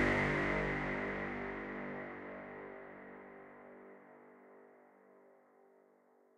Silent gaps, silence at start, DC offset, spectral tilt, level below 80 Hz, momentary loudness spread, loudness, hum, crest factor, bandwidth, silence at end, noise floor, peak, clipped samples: none; 0 s; under 0.1%; -6.5 dB/octave; -56 dBFS; 26 LU; -39 LUFS; none; 22 dB; 11.5 kHz; 1.05 s; -69 dBFS; -20 dBFS; under 0.1%